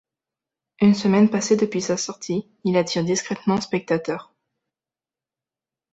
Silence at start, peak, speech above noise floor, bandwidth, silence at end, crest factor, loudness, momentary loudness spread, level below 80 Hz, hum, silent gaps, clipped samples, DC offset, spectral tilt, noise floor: 0.8 s; -6 dBFS; over 69 dB; 8.2 kHz; 1.7 s; 18 dB; -21 LUFS; 9 LU; -62 dBFS; none; none; under 0.1%; under 0.1%; -5 dB/octave; under -90 dBFS